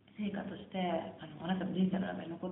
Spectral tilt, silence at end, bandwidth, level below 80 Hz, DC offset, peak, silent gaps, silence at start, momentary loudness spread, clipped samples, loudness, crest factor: -5.5 dB/octave; 0 s; 3.9 kHz; -72 dBFS; under 0.1%; -22 dBFS; none; 0.15 s; 9 LU; under 0.1%; -37 LUFS; 16 dB